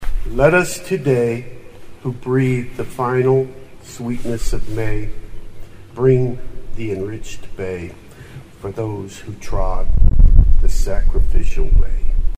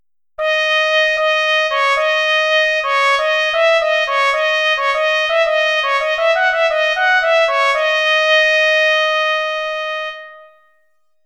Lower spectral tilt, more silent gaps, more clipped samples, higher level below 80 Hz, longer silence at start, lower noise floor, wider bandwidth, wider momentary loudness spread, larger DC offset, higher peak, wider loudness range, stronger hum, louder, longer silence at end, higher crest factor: first, -7 dB/octave vs 3 dB/octave; neither; neither; first, -18 dBFS vs -56 dBFS; second, 0 s vs 0.4 s; second, -37 dBFS vs -65 dBFS; about the same, 10 kHz vs 11 kHz; first, 21 LU vs 6 LU; neither; about the same, 0 dBFS vs -2 dBFS; first, 6 LU vs 1 LU; neither; second, -20 LUFS vs -14 LUFS; second, 0 s vs 0.8 s; about the same, 14 dB vs 14 dB